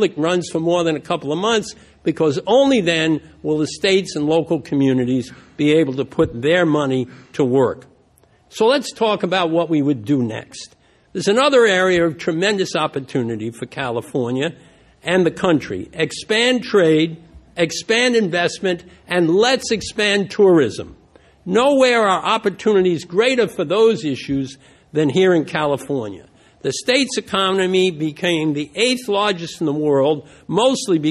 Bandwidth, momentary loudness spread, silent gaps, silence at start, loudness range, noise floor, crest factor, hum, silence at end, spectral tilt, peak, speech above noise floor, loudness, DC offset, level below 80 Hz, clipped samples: 12.5 kHz; 10 LU; none; 0 s; 3 LU; -55 dBFS; 16 dB; none; 0 s; -5 dB/octave; -2 dBFS; 37 dB; -18 LUFS; under 0.1%; -52 dBFS; under 0.1%